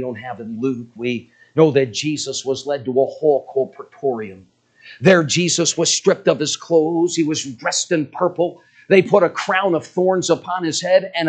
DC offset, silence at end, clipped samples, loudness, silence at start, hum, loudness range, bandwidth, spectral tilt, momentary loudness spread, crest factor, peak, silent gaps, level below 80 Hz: under 0.1%; 0 s; under 0.1%; -18 LUFS; 0 s; none; 3 LU; 9.4 kHz; -4 dB/octave; 10 LU; 18 dB; 0 dBFS; none; -66 dBFS